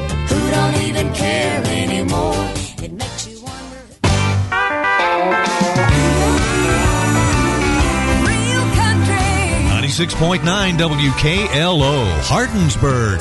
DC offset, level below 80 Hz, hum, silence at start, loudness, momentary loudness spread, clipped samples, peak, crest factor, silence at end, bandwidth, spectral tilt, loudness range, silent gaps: under 0.1%; -26 dBFS; none; 0 s; -16 LUFS; 7 LU; under 0.1%; -2 dBFS; 14 dB; 0 s; 12 kHz; -4.5 dB/octave; 5 LU; none